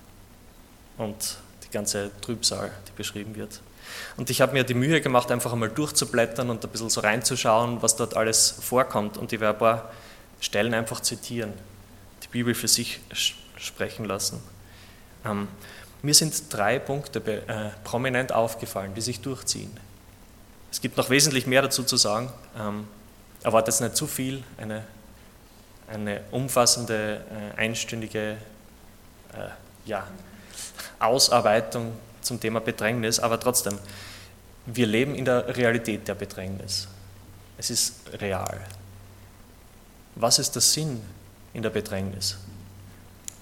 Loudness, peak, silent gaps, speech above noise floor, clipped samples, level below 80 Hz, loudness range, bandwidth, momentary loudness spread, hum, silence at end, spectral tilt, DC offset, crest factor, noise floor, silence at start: -25 LUFS; -4 dBFS; none; 25 dB; under 0.1%; -54 dBFS; 7 LU; 17.5 kHz; 19 LU; none; 0 s; -3 dB/octave; under 0.1%; 24 dB; -50 dBFS; 0 s